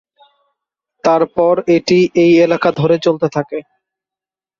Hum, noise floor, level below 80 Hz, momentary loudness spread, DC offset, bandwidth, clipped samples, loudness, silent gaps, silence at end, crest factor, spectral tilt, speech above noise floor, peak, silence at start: none; -89 dBFS; -54 dBFS; 9 LU; under 0.1%; 7.2 kHz; under 0.1%; -13 LUFS; none; 1 s; 14 dB; -6.5 dB/octave; 77 dB; -2 dBFS; 1.05 s